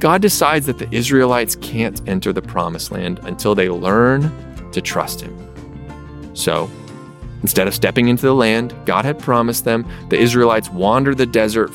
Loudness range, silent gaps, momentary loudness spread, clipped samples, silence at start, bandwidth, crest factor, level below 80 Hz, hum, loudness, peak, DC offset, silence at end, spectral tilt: 6 LU; none; 19 LU; under 0.1%; 0 s; 17 kHz; 16 dB; -40 dBFS; none; -16 LUFS; 0 dBFS; under 0.1%; 0 s; -5 dB/octave